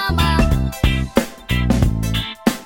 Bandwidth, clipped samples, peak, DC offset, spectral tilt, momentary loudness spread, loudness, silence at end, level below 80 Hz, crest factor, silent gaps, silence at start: 17 kHz; under 0.1%; -2 dBFS; under 0.1%; -5.5 dB/octave; 5 LU; -19 LUFS; 0 s; -22 dBFS; 16 dB; none; 0 s